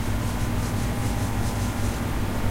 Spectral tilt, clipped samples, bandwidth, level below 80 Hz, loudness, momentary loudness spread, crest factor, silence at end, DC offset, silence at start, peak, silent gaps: -5.5 dB/octave; under 0.1%; 16 kHz; -32 dBFS; -27 LUFS; 1 LU; 12 dB; 0 s; under 0.1%; 0 s; -12 dBFS; none